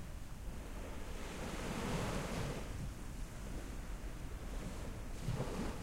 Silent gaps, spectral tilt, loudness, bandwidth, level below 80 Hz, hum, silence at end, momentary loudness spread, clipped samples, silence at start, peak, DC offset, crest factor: none; -5 dB/octave; -45 LUFS; 16 kHz; -46 dBFS; none; 0 s; 8 LU; under 0.1%; 0 s; -26 dBFS; under 0.1%; 16 dB